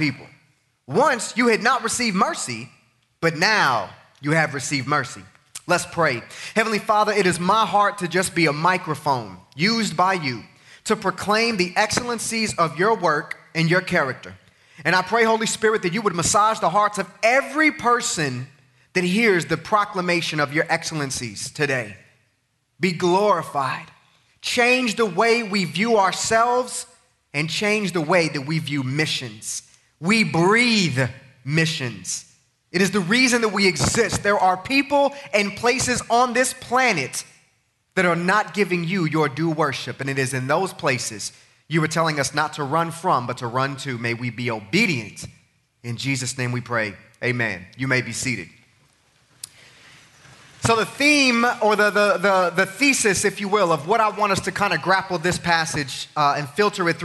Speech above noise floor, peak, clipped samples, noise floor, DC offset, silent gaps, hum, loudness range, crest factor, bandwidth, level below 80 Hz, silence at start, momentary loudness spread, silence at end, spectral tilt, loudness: 48 dB; -4 dBFS; under 0.1%; -69 dBFS; under 0.1%; none; none; 5 LU; 18 dB; 12 kHz; -56 dBFS; 0 s; 11 LU; 0 s; -4 dB/octave; -21 LUFS